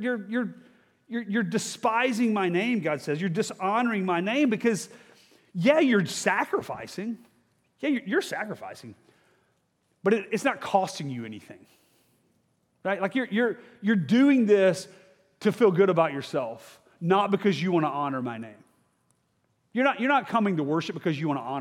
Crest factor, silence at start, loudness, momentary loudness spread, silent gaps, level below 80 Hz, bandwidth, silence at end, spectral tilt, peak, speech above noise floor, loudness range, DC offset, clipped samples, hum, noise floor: 20 dB; 0 s; -26 LUFS; 14 LU; none; -78 dBFS; 15.5 kHz; 0 s; -5.5 dB/octave; -6 dBFS; 46 dB; 7 LU; under 0.1%; under 0.1%; none; -72 dBFS